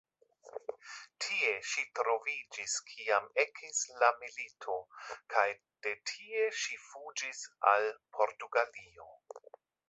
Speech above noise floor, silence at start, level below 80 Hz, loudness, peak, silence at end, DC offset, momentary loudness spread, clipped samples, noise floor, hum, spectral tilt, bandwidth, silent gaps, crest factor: 24 dB; 0.45 s; -84 dBFS; -34 LUFS; -12 dBFS; 0.5 s; under 0.1%; 17 LU; under 0.1%; -59 dBFS; none; 1.5 dB/octave; 8.2 kHz; none; 24 dB